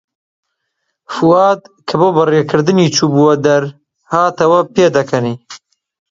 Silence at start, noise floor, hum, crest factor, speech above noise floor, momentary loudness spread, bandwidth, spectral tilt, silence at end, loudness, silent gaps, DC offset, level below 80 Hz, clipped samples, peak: 1.1 s; -71 dBFS; none; 14 dB; 59 dB; 10 LU; 7.8 kHz; -5.5 dB/octave; 0.55 s; -12 LUFS; none; under 0.1%; -56 dBFS; under 0.1%; 0 dBFS